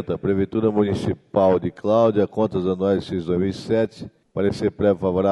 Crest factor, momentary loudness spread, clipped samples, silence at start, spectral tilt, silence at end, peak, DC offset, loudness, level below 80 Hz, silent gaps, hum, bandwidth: 16 dB; 6 LU; under 0.1%; 0 s; -8 dB/octave; 0 s; -4 dBFS; under 0.1%; -21 LUFS; -50 dBFS; none; none; 11.5 kHz